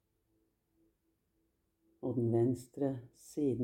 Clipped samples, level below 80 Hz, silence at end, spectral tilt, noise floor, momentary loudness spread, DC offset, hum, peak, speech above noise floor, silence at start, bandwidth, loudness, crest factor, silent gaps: under 0.1%; -72 dBFS; 0 s; -9 dB/octave; -79 dBFS; 13 LU; under 0.1%; none; -20 dBFS; 45 dB; 2 s; 16 kHz; -36 LUFS; 18 dB; none